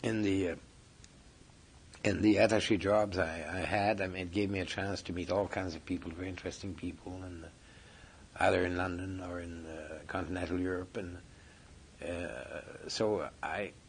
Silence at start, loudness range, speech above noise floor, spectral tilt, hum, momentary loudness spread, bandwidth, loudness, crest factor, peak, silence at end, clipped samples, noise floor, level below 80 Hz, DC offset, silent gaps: 0 s; 9 LU; 24 dB; -5.5 dB/octave; none; 16 LU; 10.5 kHz; -34 LUFS; 22 dB; -14 dBFS; 0 s; under 0.1%; -58 dBFS; -60 dBFS; under 0.1%; none